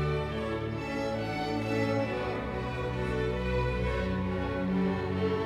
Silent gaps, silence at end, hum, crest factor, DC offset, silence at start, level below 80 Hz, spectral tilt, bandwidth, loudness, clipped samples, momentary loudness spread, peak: none; 0 s; none; 14 dB; under 0.1%; 0 s; -42 dBFS; -7.5 dB/octave; 12.5 kHz; -31 LUFS; under 0.1%; 4 LU; -18 dBFS